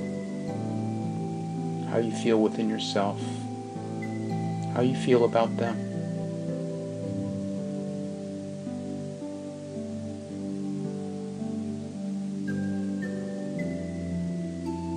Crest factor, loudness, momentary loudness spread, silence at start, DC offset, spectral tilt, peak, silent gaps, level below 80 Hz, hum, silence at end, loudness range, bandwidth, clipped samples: 22 dB; -31 LUFS; 11 LU; 0 s; under 0.1%; -7 dB/octave; -8 dBFS; none; -64 dBFS; none; 0 s; 7 LU; 10.5 kHz; under 0.1%